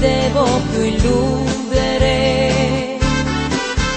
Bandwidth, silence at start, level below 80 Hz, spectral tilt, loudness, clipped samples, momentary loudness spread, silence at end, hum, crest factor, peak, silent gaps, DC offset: 8.8 kHz; 0 s; -24 dBFS; -5 dB/octave; -16 LUFS; under 0.1%; 4 LU; 0 s; none; 14 dB; -2 dBFS; none; under 0.1%